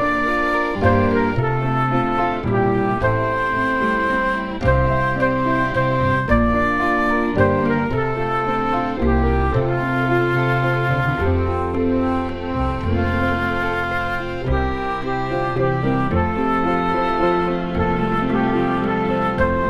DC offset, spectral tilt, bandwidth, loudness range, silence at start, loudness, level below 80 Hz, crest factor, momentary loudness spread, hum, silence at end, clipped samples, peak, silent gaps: 0.9%; -8 dB/octave; 11.5 kHz; 3 LU; 0 s; -19 LUFS; -30 dBFS; 18 dB; 4 LU; none; 0 s; under 0.1%; -2 dBFS; none